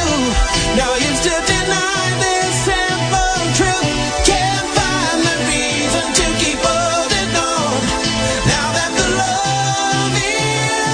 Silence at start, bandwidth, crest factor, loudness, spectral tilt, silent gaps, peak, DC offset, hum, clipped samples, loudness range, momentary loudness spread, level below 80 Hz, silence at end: 0 s; 10 kHz; 16 dB; -15 LUFS; -3 dB/octave; none; 0 dBFS; under 0.1%; none; under 0.1%; 1 LU; 2 LU; -28 dBFS; 0 s